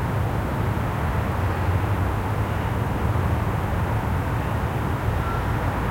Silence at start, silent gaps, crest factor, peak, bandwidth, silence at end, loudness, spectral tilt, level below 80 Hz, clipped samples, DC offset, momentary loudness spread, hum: 0 s; none; 14 dB; -10 dBFS; 16.5 kHz; 0 s; -25 LUFS; -7.5 dB/octave; -32 dBFS; under 0.1%; under 0.1%; 2 LU; none